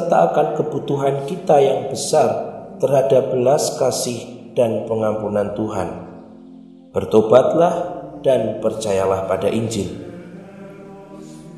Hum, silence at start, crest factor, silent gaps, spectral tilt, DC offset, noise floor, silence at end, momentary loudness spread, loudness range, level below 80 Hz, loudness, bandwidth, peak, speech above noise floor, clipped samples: none; 0 s; 18 dB; none; -5.5 dB/octave; under 0.1%; -41 dBFS; 0 s; 22 LU; 4 LU; -56 dBFS; -18 LUFS; 13 kHz; 0 dBFS; 24 dB; under 0.1%